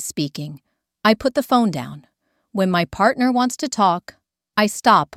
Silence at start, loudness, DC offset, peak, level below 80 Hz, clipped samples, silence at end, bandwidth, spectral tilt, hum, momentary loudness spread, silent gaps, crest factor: 0 s; -19 LUFS; under 0.1%; -2 dBFS; -54 dBFS; under 0.1%; 0.15 s; 16 kHz; -4.5 dB/octave; none; 13 LU; none; 18 dB